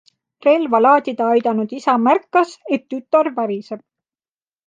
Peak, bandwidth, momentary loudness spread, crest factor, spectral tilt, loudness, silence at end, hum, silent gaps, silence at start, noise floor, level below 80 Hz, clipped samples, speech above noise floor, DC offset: -2 dBFS; 9.2 kHz; 10 LU; 16 dB; -6 dB/octave; -17 LUFS; 0.9 s; none; none; 0.45 s; under -90 dBFS; -74 dBFS; under 0.1%; over 73 dB; under 0.1%